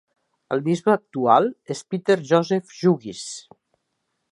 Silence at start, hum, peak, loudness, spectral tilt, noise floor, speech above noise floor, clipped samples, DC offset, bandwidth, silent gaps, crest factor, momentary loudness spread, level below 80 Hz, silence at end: 0.5 s; none; -2 dBFS; -21 LUFS; -6 dB/octave; -76 dBFS; 54 dB; under 0.1%; under 0.1%; 11.5 kHz; none; 20 dB; 15 LU; -72 dBFS; 0.9 s